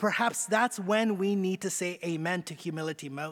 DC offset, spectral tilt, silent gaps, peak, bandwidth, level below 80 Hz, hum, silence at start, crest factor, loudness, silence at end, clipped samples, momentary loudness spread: under 0.1%; -4 dB/octave; none; -12 dBFS; 18 kHz; -82 dBFS; none; 0 s; 18 dB; -30 LUFS; 0 s; under 0.1%; 9 LU